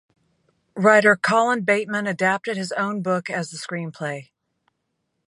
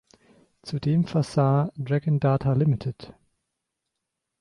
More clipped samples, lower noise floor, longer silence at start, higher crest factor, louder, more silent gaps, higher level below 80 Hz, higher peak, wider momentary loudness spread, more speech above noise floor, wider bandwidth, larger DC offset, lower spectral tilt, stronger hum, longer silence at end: neither; second, -75 dBFS vs -83 dBFS; about the same, 0.75 s vs 0.65 s; first, 22 dB vs 16 dB; first, -21 LUFS vs -24 LUFS; neither; second, -72 dBFS vs -56 dBFS; first, -2 dBFS vs -10 dBFS; first, 15 LU vs 12 LU; second, 54 dB vs 59 dB; about the same, 11.5 kHz vs 10.5 kHz; neither; second, -5 dB/octave vs -8.5 dB/octave; neither; second, 1.05 s vs 1.3 s